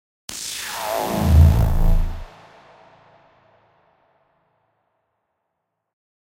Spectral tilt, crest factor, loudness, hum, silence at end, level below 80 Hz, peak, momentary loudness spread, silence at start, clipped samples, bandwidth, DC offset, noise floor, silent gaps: -6 dB/octave; 20 dB; -20 LUFS; none; 3.95 s; -24 dBFS; -2 dBFS; 19 LU; 0.3 s; under 0.1%; 16.5 kHz; under 0.1%; -78 dBFS; none